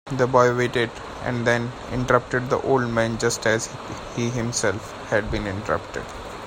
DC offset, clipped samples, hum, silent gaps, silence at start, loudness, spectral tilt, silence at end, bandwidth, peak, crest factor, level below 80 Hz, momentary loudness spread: under 0.1%; under 0.1%; none; none; 0.05 s; -23 LUFS; -4.5 dB/octave; 0 s; 16 kHz; -2 dBFS; 20 dB; -44 dBFS; 11 LU